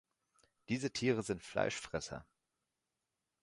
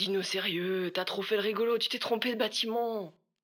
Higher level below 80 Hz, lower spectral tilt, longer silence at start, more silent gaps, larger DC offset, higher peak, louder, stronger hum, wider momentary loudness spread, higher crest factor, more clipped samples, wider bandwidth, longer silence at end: first, -66 dBFS vs under -90 dBFS; about the same, -4.5 dB/octave vs -3.5 dB/octave; first, 0.7 s vs 0 s; neither; neither; second, -18 dBFS vs -14 dBFS; second, -38 LUFS vs -31 LUFS; neither; first, 9 LU vs 4 LU; about the same, 22 dB vs 18 dB; neither; second, 11.5 kHz vs 20 kHz; first, 1.2 s vs 0.35 s